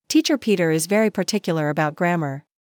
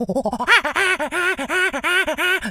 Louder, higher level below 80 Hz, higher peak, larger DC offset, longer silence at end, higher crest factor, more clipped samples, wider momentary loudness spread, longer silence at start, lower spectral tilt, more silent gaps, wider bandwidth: second, -21 LUFS vs -18 LUFS; second, -72 dBFS vs -50 dBFS; second, -8 dBFS vs 0 dBFS; neither; first, 0.35 s vs 0 s; second, 14 dB vs 20 dB; neither; about the same, 6 LU vs 5 LU; about the same, 0.1 s vs 0 s; first, -5 dB/octave vs -2.5 dB/octave; neither; about the same, 20 kHz vs 19 kHz